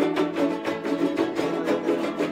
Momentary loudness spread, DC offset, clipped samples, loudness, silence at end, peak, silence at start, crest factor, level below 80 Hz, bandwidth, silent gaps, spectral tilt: 2 LU; under 0.1%; under 0.1%; -25 LUFS; 0 s; -10 dBFS; 0 s; 16 dB; -66 dBFS; 15.5 kHz; none; -5.5 dB/octave